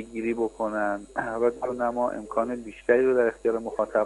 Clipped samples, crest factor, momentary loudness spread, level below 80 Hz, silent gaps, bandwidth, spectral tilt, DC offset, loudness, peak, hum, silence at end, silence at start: under 0.1%; 18 dB; 8 LU; -56 dBFS; none; 11.5 kHz; -6.5 dB/octave; under 0.1%; -26 LUFS; -8 dBFS; none; 0 s; 0 s